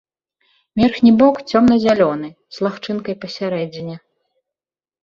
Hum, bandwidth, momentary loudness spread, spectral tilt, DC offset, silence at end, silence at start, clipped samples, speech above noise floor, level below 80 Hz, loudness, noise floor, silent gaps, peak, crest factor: none; 7.2 kHz; 17 LU; -7 dB/octave; under 0.1%; 1.05 s; 0.75 s; under 0.1%; over 74 dB; -50 dBFS; -16 LUFS; under -90 dBFS; none; -2 dBFS; 16 dB